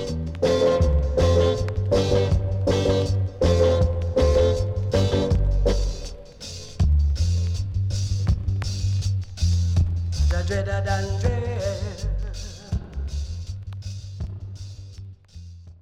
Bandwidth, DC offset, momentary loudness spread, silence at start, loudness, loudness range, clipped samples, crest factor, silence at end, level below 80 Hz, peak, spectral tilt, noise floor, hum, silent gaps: 10 kHz; under 0.1%; 17 LU; 0 s; -23 LUFS; 10 LU; under 0.1%; 14 dB; 0.1 s; -28 dBFS; -8 dBFS; -6.5 dB/octave; -42 dBFS; none; none